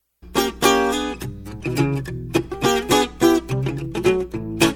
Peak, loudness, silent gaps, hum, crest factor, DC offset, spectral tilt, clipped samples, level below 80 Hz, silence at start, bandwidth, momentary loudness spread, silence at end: 0 dBFS; -21 LUFS; none; none; 20 dB; under 0.1%; -4.5 dB/octave; under 0.1%; -40 dBFS; 0.25 s; 17 kHz; 11 LU; 0 s